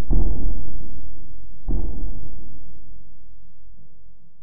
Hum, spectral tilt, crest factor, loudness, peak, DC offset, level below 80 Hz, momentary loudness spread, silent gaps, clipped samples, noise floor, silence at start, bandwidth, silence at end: none; -14 dB/octave; 12 dB; -32 LUFS; -4 dBFS; 20%; -28 dBFS; 24 LU; none; under 0.1%; -45 dBFS; 0 s; 1.3 kHz; 0 s